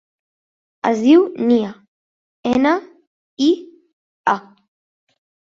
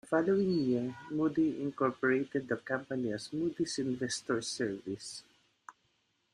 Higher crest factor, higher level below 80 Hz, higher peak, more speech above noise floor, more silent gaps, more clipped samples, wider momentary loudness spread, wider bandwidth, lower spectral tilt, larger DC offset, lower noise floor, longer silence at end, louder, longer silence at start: about the same, 18 dB vs 18 dB; first, -60 dBFS vs -72 dBFS; first, -2 dBFS vs -16 dBFS; first, over 75 dB vs 43 dB; first, 1.88-2.43 s, 3.07-3.37 s, 3.93-4.24 s vs none; neither; first, 11 LU vs 8 LU; second, 7.6 kHz vs 11 kHz; about the same, -5.5 dB/octave vs -5 dB/octave; neither; first, under -90 dBFS vs -76 dBFS; first, 1.1 s vs 0.6 s; first, -18 LUFS vs -33 LUFS; first, 0.85 s vs 0.05 s